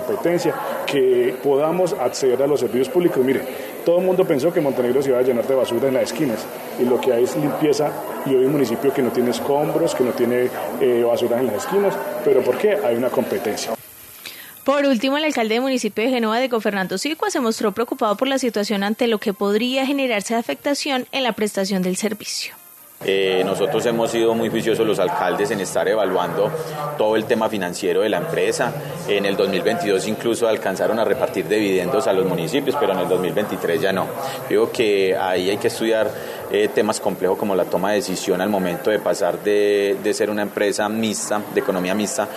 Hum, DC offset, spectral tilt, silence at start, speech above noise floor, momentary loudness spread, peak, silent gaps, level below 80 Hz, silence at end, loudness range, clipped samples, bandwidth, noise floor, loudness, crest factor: none; under 0.1%; -4.5 dB/octave; 0 s; 21 dB; 5 LU; -4 dBFS; none; -66 dBFS; 0 s; 2 LU; under 0.1%; 14 kHz; -40 dBFS; -20 LUFS; 16 dB